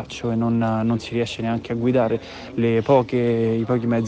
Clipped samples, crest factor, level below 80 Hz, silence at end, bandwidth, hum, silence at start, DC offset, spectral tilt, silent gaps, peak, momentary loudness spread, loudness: under 0.1%; 14 dB; -50 dBFS; 0 s; 8.6 kHz; none; 0 s; under 0.1%; -7.5 dB/octave; none; -6 dBFS; 7 LU; -21 LUFS